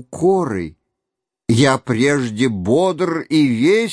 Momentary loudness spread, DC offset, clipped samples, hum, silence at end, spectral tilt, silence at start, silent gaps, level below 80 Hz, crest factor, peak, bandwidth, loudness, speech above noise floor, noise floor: 9 LU; under 0.1%; under 0.1%; none; 0 s; -6 dB/octave; 0.1 s; none; -52 dBFS; 16 dB; 0 dBFS; 11 kHz; -17 LUFS; 66 dB; -82 dBFS